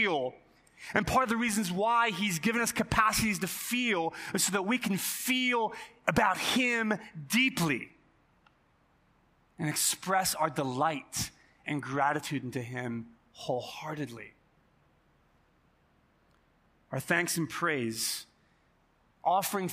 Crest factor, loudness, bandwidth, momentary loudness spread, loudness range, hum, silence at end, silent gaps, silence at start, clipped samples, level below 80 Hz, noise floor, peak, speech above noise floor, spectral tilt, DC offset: 26 dB; -30 LUFS; 15.5 kHz; 12 LU; 11 LU; none; 0 s; none; 0 s; under 0.1%; -58 dBFS; -68 dBFS; -6 dBFS; 38 dB; -3.5 dB/octave; under 0.1%